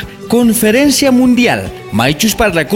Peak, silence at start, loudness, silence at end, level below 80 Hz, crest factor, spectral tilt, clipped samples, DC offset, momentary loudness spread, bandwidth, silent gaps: 0 dBFS; 0 s; -11 LUFS; 0 s; -34 dBFS; 10 dB; -4 dB/octave; under 0.1%; under 0.1%; 6 LU; 17 kHz; none